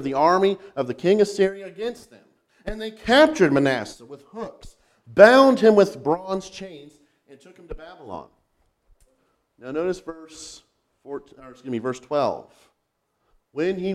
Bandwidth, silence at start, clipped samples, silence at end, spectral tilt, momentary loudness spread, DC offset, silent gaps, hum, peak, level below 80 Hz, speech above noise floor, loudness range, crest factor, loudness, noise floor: 13.5 kHz; 0 s; under 0.1%; 0 s; -5.5 dB/octave; 25 LU; under 0.1%; none; none; 0 dBFS; -52 dBFS; 53 dB; 17 LU; 22 dB; -20 LUFS; -74 dBFS